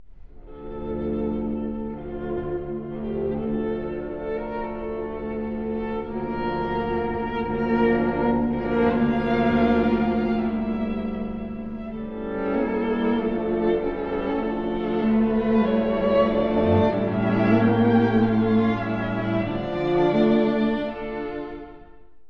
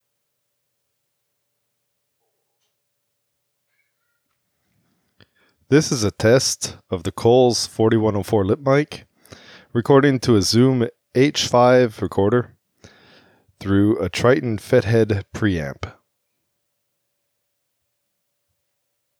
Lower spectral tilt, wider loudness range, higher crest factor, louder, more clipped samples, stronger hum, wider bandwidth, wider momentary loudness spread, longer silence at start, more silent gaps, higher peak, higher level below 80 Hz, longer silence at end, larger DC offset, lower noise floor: first, -9.5 dB/octave vs -5.5 dB/octave; about the same, 9 LU vs 8 LU; about the same, 18 dB vs 18 dB; second, -24 LUFS vs -18 LUFS; neither; neither; second, 5.4 kHz vs 16 kHz; about the same, 11 LU vs 12 LU; second, 0 s vs 5.7 s; neither; about the same, -6 dBFS vs -4 dBFS; first, -42 dBFS vs -52 dBFS; second, 0 s vs 3.3 s; neither; second, -49 dBFS vs -75 dBFS